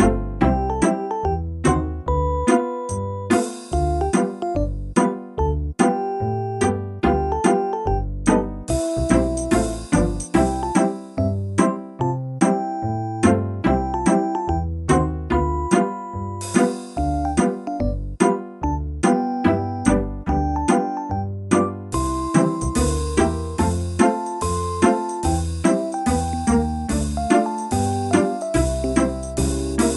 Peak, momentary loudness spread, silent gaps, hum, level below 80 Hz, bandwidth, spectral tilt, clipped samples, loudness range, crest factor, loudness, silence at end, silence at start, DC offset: 0 dBFS; 5 LU; none; none; -30 dBFS; 12 kHz; -6 dB/octave; under 0.1%; 1 LU; 20 dB; -21 LUFS; 0 s; 0 s; under 0.1%